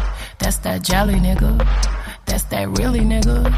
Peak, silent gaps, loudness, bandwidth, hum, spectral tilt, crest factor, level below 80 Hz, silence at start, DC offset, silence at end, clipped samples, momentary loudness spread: -2 dBFS; none; -19 LUFS; 15.5 kHz; none; -5 dB/octave; 14 dB; -18 dBFS; 0 s; under 0.1%; 0 s; under 0.1%; 7 LU